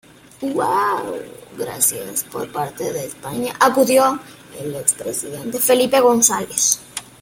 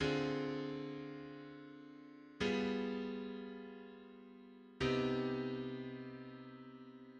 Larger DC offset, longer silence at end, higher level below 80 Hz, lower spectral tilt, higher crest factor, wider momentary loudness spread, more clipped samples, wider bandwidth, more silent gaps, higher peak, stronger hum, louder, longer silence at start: neither; first, 0.2 s vs 0 s; first, -58 dBFS vs -66 dBFS; second, -2.5 dB/octave vs -6 dB/octave; about the same, 20 dB vs 18 dB; second, 16 LU vs 20 LU; neither; first, 17 kHz vs 9.2 kHz; neither; first, 0 dBFS vs -24 dBFS; neither; first, -18 LUFS vs -41 LUFS; first, 0.4 s vs 0 s